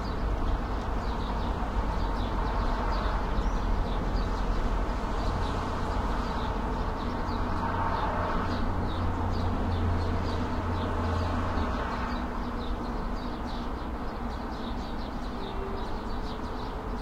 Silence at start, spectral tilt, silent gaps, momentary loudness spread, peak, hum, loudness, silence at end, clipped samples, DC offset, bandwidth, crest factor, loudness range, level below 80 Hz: 0 s; -7 dB/octave; none; 6 LU; -16 dBFS; none; -32 LUFS; 0 s; under 0.1%; under 0.1%; 9.8 kHz; 14 dB; 5 LU; -32 dBFS